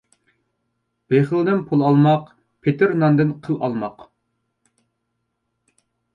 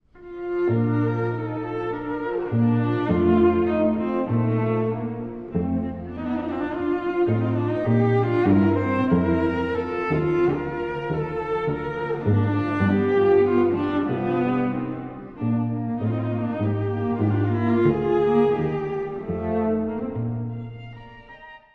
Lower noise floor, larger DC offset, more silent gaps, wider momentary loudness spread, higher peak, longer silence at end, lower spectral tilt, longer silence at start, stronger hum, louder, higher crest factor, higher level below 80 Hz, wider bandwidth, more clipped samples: first, -75 dBFS vs -45 dBFS; neither; neither; about the same, 9 LU vs 10 LU; about the same, -4 dBFS vs -6 dBFS; first, 2.25 s vs 0.15 s; about the same, -10 dB/octave vs -10 dB/octave; first, 1.1 s vs 0.15 s; neither; first, -19 LUFS vs -23 LUFS; about the same, 18 dB vs 16 dB; second, -64 dBFS vs -48 dBFS; about the same, 5.4 kHz vs 5.2 kHz; neither